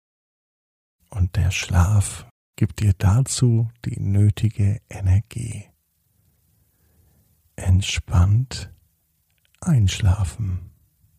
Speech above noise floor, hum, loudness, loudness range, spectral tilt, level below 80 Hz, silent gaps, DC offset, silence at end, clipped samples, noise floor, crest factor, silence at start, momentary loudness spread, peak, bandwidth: 47 dB; none; -21 LUFS; 6 LU; -5.5 dB/octave; -36 dBFS; 2.31-2.54 s; under 0.1%; 0.5 s; under 0.1%; -67 dBFS; 18 dB; 1.1 s; 13 LU; -4 dBFS; 14 kHz